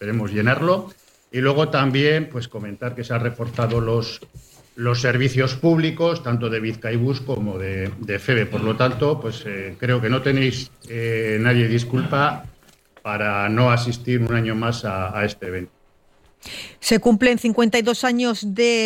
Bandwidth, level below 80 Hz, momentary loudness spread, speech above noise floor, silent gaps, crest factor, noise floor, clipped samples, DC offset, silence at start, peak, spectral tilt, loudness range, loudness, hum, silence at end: 16 kHz; -50 dBFS; 12 LU; 35 dB; none; 16 dB; -56 dBFS; under 0.1%; under 0.1%; 0 s; -4 dBFS; -6 dB/octave; 2 LU; -21 LUFS; none; 0 s